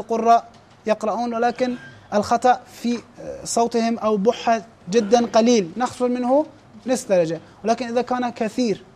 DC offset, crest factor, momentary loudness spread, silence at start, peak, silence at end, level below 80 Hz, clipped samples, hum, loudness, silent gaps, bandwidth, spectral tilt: under 0.1%; 16 dB; 9 LU; 0 s; -4 dBFS; 0.15 s; -60 dBFS; under 0.1%; none; -21 LUFS; none; 14 kHz; -4.5 dB/octave